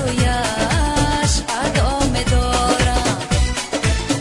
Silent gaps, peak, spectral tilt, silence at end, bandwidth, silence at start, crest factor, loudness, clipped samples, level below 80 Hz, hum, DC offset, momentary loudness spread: none; -4 dBFS; -4 dB/octave; 0 s; 11.5 kHz; 0 s; 14 dB; -18 LUFS; under 0.1%; -24 dBFS; none; under 0.1%; 3 LU